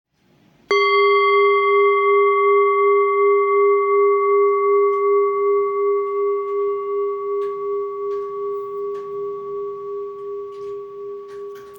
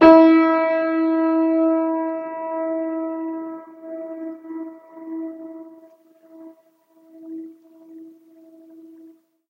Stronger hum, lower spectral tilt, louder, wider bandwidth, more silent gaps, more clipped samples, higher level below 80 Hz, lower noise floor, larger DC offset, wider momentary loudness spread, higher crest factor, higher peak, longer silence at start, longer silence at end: neither; second, -4 dB/octave vs -7.5 dB/octave; about the same, -18 LUFS vs -19 LUFS; first, 6.4 kHz vs 5.8 kHz; neither; neither; second, -74 dBFS vs -60 dBFS; about the same, -57 dBFS vs -57 dBFS; neither; second, 16 LU vs 21 LU; second, 12 dB vs 22 dB; second, -6 dBFS vs 0 dBFS; first, 0.7 s vs 0 s; second, 0 s vs 0.65 s